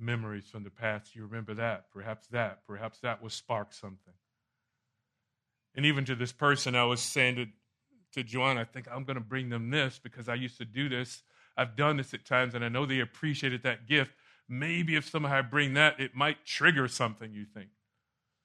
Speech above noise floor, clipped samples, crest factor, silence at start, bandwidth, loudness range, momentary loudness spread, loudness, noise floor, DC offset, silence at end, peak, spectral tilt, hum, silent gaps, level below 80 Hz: 53 dB; under 0.1%; 26 dB; 0 s; 13 kHz; 10 LU; 16 LU; -31 LUFS; -85 dBFS; under 0.1%; 0.8 s; -6 dBFS; -4.5 dB/octave; none; none; -74 dBFS